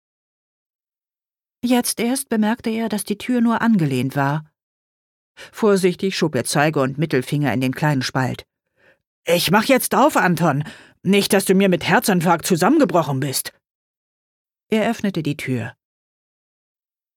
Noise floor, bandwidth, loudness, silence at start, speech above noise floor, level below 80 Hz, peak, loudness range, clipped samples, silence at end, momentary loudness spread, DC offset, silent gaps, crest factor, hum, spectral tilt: under -90 dBFS; 19 kHz; -19 LUFS; 1.65 s; over 72 dB; -60 dBFS; -2 dBFS; 6 LU; under 0.1%; 1.45 s; 10 LU; under 0.1%; 4.63-5.35 s, 9.07-9.23 s, 13.70-14.45 s; 18 dB; none; -5 dB/octave